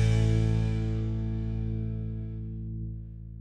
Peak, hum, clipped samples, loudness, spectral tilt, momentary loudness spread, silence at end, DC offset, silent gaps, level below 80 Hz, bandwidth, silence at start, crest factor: -14 dBFS; none; under 0.1%; -31 LUFS; -8 dB/octave; 13 LU; 0 s; under 0.1%; none; -36 dBFS; 9 kHz; 0 s; 14 dB